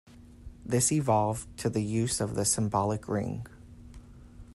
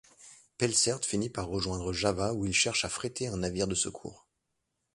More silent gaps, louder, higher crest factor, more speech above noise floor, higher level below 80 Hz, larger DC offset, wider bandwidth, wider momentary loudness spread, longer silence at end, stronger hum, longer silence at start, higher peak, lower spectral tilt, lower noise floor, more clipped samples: neither; about the same, -29 LUFS vs -30 LUFS; about the same, 18 dB vs 20 dB; second, 21 dB vs 50 dB; about the same, -52 dBFS vs -52 dBFS; neither; first, 13 kHz vs 11.5 kHz; first, 11 LU vs 8 LU; second, 0.05 s vs 0.8 s; neither; about the same, 0.1 s vs 0.2 s; about the same, -12 dBFS vs -12 dBFS; first, -5 dB/octave vs -3 dB/octave; second, -49 dBFS vs -82 dBFS; neither